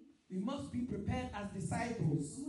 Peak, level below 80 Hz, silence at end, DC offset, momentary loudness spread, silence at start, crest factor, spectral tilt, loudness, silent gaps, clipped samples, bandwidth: -24 dBFS; -58 dBFS; 0 s; under 0.1%; 6 LU; 0 s; 14 dB; -6.5 dB/octave; -40 LUFS; none; under 0.1%; 11.5 kHz